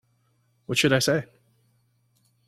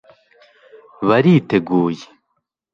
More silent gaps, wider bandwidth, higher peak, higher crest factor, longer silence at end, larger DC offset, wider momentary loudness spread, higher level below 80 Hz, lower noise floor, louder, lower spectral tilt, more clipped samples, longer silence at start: neither; first, 15.5 kHz vs 7.2 kHz; second, -8 dBFS vs -2 dBFS; about the same, 22 dB vs 18 dB; first, 1.25 s vs 0.7 s; neither; first, 26 LU vs 10 LU; about the same, -62 dBFS vs -58 dBFS; second, -68 dBFS vs -72 dBFS; second, -23 LUFS vs -16 LUFS; second, -4 dB/octave vs -8.5 dB/octave; neither; second, 0.7 s vs 1 s